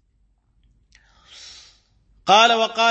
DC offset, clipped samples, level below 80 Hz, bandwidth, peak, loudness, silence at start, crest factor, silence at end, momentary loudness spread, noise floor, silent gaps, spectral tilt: under 0.1%; under 0.1%; -62 dBFS; 8.4 kHz; -2 dBFS; -16 LUFS; 2.25 s; 20 dB; 0 s; 27 LU; -63 dBFS; none; -1.5 dB/octave